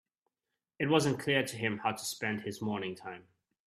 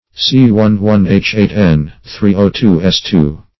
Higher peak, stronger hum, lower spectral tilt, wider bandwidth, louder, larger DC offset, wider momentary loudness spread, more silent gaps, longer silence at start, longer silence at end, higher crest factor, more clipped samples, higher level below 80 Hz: second, -12 dBFS vs 0 dBFS; neither; second, -4.5 dB/octave vs -7 dB/octave; first, 14.5 kHz vs 6 kHz; second, -33 LUFS vs -11 LUFS; second, under 0.1% vs 0.9%; first, 14 LU vs 5 LU; neither; first, 0.8 s vs 0.15 s; first, 0.45 s vs 0.2 s; first, 22 dB vs 10 dB; second, under 0.1% vs 0.2%; second, -72 dBFS vs -32 dBFS